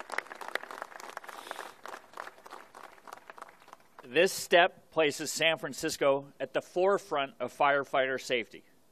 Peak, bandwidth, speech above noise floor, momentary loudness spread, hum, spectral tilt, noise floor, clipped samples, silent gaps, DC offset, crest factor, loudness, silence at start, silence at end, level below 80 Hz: -8 dBFS; 14 kHz; 27 dB; 22 LU; none; -2.5 dB/octave; -56 dBFS; under 0.1%; none; under 0.1%; 24 dB; -30 LUFS; 0.1 s; 0.3 s; -76 dBFS